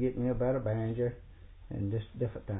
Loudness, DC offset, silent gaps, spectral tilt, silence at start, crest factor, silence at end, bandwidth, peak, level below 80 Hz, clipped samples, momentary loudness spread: -34 LUFS; under 0.1%; none; -8 dB/octave; 0 s; 14 dB; 0 s; 3.8 kHz; -20 dBFS; -50 dBFS; under 0.1%; 8 LU